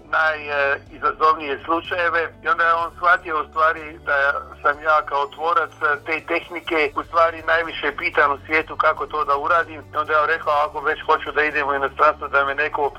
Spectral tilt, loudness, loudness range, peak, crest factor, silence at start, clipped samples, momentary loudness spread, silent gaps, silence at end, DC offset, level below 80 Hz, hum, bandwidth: -4.5 dB/octave; -20 LUFS; 1 LU; -2 dBFS; 18 dB; 0.1 s; under 0.1%; 6 LU; none; 0 s; under 0.1%; -50 dBFS; none; 14.5 kHz